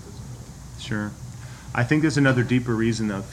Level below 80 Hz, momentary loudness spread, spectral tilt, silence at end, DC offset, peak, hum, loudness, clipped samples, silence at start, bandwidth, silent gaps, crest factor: -46 dBFS; 20 LU; -6 dB/octave; 0 s; under 0.1%; -6 dBFS; none; -23 LUFS; under 0.1%; 0 s; 14 kHz; none; 18 dB